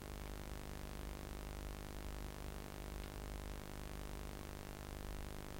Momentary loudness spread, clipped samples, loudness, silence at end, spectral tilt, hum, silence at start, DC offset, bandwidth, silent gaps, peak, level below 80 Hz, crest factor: 1 LU; under 0.1%; -50 LUFS; 0 s; -5 dB/octave; none; 0 s; under 0.1%; 16.5 kHz; none; -30 dBFS; -50 dBFS; 18 dB